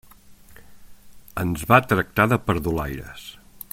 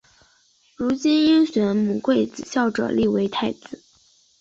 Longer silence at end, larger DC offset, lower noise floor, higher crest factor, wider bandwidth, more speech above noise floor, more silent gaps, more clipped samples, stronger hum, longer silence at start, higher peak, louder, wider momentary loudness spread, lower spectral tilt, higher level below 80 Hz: second, 0.4 s vs 0.65 s; neither; second, -47 dBFS vs -60 dBFS; first, 22 dB vs 14 dB; first, 16.5 kHz vs 7.8 kHz; second, 26 dB vs 40 dB; neither; neither; neither; second, 0.3 s vs 0.8 s; first, -2 dBFS vs -8 dBFS; about the same, -21 LUFS vs -21 LUFS; first, 22 LU vs 11 LU; about the same, -6 dB/octave vs -5.5 dB/octave; first, -44 dBFS vs -56 dBFS